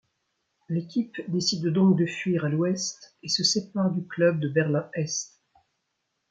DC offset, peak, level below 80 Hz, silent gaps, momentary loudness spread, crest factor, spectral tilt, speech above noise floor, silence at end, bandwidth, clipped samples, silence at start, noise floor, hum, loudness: under 0.1%; -8 dBFS; -70 dBFS; none; 10 LU; 18 dB; -5 dB/octave; 53 dB; 1.05 s; 9.2 kHz; under 0.1%; 0.7 s; -78 dBFS; none; -26 LUFS